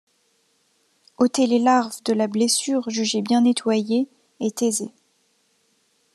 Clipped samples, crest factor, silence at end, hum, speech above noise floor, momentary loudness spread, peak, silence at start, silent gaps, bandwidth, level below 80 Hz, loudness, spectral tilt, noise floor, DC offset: under 0.1%; 18 dB; 1.25 s; none; 45 dB; 9 LU; -4 dBFS; 1.2 s; none; 13 kHz; -76 dBFS; -21 LUFS; -3.5 dB/octave; -66 dBFS; under 0.1%